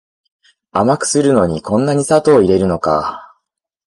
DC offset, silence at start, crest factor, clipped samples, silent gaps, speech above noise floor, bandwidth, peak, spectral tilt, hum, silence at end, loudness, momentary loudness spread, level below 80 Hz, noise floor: under 0.1%; 0.75 s; 14 dB; under 0.1%; none; 59 dB; 11.5 kHz; -2 dBFS; -5.5 dB/octave; none; 0.6 s; -14 LUFS; 8 LU; -42 dBFS; -72 dBFS